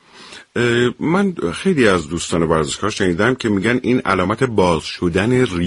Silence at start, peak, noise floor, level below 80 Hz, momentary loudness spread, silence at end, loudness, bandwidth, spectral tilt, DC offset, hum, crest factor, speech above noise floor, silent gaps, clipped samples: 0.15 s; 0 dBFS; -40 dBFS; -42 dBFS; 5 LU; 0 s; -17 LUFS; 11.5 kHz; -5.5 dB/octave; under 0.1%; none; 16 dB; 23 dB; none; under 0.1%